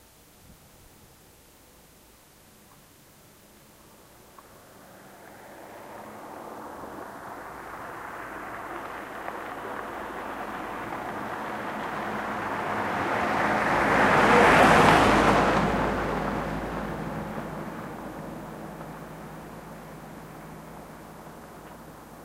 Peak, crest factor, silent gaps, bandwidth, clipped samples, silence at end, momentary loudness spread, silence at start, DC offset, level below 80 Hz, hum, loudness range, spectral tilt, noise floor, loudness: -4 dBFS; 24 dB; none; 16 kHz; under 0.1%; 0 s; 25 LU; 0.5 s; under 0.1%; -48 dBFS; none; 23 LU; -5 dB/octave; -55 dBFS; -25 LUFS